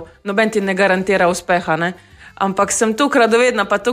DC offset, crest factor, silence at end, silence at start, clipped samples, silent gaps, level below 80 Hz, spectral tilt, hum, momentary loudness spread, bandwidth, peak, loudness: under 0.1%; 14 dB; 0 s; 0 s; under 0.1%; none; -52 dBFS; -4 dB/octave; none; 7 LU; 15.5 kHz; -2 dBFS; -16 LUFS